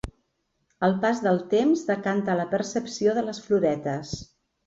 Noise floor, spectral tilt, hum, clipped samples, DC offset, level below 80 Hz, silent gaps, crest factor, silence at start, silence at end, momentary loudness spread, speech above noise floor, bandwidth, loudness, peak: -74 dBFS; -6 dB/octave; none; under 0.1%; under 0.1%; -52 dBFS; none; 16 dB; 0.05 s; 0.4 s; 9 LU; 50 dB; 8 kHz; -25 LUFS; -10 dBFS